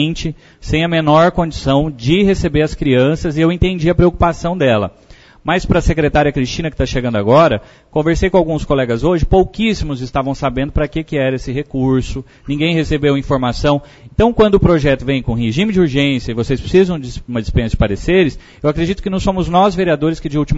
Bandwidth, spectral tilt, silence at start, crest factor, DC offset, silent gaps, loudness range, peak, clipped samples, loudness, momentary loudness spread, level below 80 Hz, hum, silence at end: 8 kHz; -7 dB/octave; 0 s; 14 dB; under 0.1%; none; 3 LU; 0 dBFS; under 0.1%; -15 LUFS; 8 LU; -26 dBFS; none; 0 s